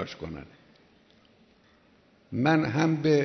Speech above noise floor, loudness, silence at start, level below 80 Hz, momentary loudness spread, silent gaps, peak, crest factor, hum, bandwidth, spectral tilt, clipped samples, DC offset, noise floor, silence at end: 36 dB; -26 LUFS; 0 s; -60 dBFS; 16 LU; none; -10 dBFS; 20 dB; none; 6.4 kHz; -7 dB/octave; under 0.1%; under 0.1%; -61 dBFS; 0 s